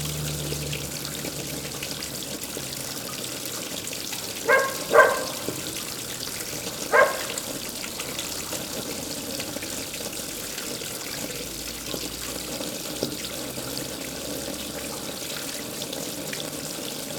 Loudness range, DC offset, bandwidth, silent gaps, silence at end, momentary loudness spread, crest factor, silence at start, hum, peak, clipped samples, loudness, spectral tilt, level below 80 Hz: 7 LU; under 0.1%; over 20 kHz; none; 0 s; 10 LU; 28 dB; 0 s; none; -2 dBFS; under 0.1%; -28 LUFS; -2.5 dB/octave; -52 dBFS